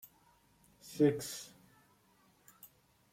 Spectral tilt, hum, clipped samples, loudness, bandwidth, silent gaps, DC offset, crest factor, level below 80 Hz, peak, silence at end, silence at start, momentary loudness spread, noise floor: -5.5 dB/octave; none; under 0.1%; -34 LUFS; 16.5 kHz; none; under 0.1%; 22 dB; -76 dBFS; -18 dBFS; 0.45 s; 0.85 s; 27 LU; -69 dBFS